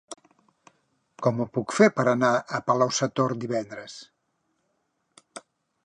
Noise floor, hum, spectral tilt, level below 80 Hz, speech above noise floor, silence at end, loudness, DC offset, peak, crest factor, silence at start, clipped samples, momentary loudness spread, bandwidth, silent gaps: -74 dBFS; none; -5 dB/octave; -70 dBFS; 50 dB; 0.45 s; -24 LUFS; under 0.1%; -4 dBFS; 22 dB; 0.1 s; under 0.1%; 24 LU; 11 kHz; none